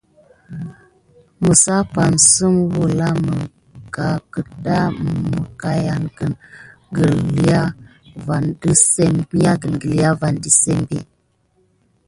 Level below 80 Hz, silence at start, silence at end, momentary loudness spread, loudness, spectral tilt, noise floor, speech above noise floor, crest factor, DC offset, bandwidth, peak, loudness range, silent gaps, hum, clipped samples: -44 dBFS; 0.5 s; 1.05 s; 16 LU; -16 LUFS; -4.5 dB/octave; -61 dBFS; 45 dB; 18 dB; under 0.1%; 11.5 kHz; 0 dBFS; 6 LU; none; none; under 0.1%